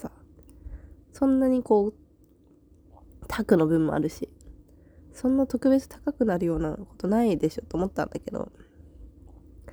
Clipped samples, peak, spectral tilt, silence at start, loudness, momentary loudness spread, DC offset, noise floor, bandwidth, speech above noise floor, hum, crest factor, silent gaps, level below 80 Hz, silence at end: under 0.1%; -8 dBFS; -7.5 dB/octave; 0 s; -26 LUFS; 18 LU; under 0.1%; -58 dBFS; over 20 kHz; 33 dB; none; 20 dB; none; -48 dBFS; 0 s